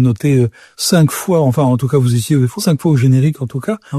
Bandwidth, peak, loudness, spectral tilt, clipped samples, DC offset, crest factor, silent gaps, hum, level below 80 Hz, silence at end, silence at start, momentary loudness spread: 14 kHz; 0 dBFS; -14 LUFS; -6.5 dB/octave; under 0.1%; under 0.1%; 12 dB; none; none; -50 dBFS; 0 s; 0 s; 7 LU